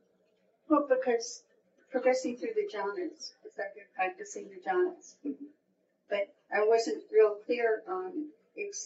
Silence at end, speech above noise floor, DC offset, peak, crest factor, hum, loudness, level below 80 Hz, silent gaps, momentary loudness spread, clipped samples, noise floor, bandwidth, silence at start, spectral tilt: 0 s; 41 dB; under 0.1%; -12 dBFS; 20 dB; none; -32 LUFS; under -90 dBFS; none; 16 LU; under 0.1%; -73 dBFS; 8 kHz; 0.7 s; -1.5 dB/octave